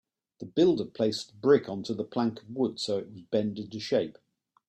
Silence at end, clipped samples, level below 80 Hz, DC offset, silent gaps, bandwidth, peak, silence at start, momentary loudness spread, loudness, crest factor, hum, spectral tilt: 0.55 s; under 0.1%; -70 dBFS; under 0.1%; none; 11.5 kHz; -10 dBFS; 0.4 s; 10 LU; -29 LUFS; 20 dB; none; -6 dB/octave